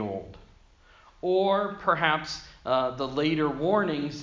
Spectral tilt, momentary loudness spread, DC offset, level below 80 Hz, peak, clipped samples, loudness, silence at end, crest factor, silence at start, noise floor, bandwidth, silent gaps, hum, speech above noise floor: -5.5 dB/octave; 11 LU; under 0.1%; -56 dBFS; -6 dBFS; under 0.1%; -27 LUFS; 0 s; 20 dB; 0 s; -56 dBFS; 7.6 kHz; none; none; 30 dB